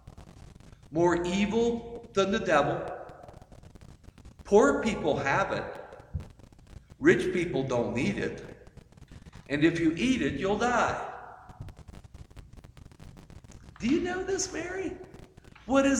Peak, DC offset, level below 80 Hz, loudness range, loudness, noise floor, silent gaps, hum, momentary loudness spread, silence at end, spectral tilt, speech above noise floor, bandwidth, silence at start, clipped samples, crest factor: -8 dBFS; under 0.1%; -52 dBFS; 6 LU; -28 LUFS; -52 dBFS; none; none; 22 LU; 0 s; -5 dB/octave; 25 dB; 10 kHz; 0.05 s; under 0.1%; 22 dB